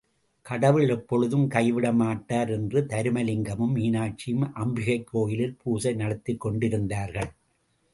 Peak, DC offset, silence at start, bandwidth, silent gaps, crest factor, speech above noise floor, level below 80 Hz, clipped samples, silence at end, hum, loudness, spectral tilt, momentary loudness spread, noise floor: -6 dBFS; under 0.1%; 0.45 s; 11.5 kHz; none; 20 dB; 44 dB; -54 dBFS; under 0.1%; 0.65 s; none; -26 LUFS; -7 dB/octave; 7 LU; -70 dBFS